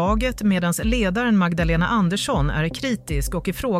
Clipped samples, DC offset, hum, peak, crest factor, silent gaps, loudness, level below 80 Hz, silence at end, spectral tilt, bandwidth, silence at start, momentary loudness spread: under 0.1%; under 0.1%; none; -8 dBFS; 12 dB; none; -21 LUFS; -30 dBFS; 0 s; -5.5 dB/octave; 16 kHz; 0 s; 6 LU